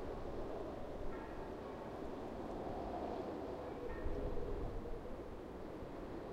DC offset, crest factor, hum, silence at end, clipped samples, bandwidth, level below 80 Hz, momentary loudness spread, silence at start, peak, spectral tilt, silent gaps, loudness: under 0.1%; 16 dB; none; 0 s; under 0.1%; 12 kHz; -50 dBFS; 5 LU; 0 s; -28 dBFS; -7.5 dB/octave; none; -47 LUFS